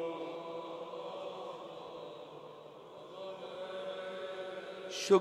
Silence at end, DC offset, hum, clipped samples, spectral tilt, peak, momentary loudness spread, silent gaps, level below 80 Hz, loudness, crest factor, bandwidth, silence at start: 0 s; under 0.1%; none; under 0.1%; -4 dB/octave; -16 dBFS; 10 LU; none; -84 dBFS; -42 LUFS; 24 dB; 13 kHz; 0 s